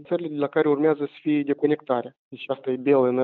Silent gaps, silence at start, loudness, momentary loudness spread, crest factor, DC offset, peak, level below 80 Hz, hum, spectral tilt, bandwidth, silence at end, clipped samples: 2.19-2.31 s; 0 s; -24 LUFS; 10 LU; 16 dB; under 0.1%; -8 dBFS; -76 dBFS; none; -6 dB/octave; 4.3 kHz; 0 s; under 0.1%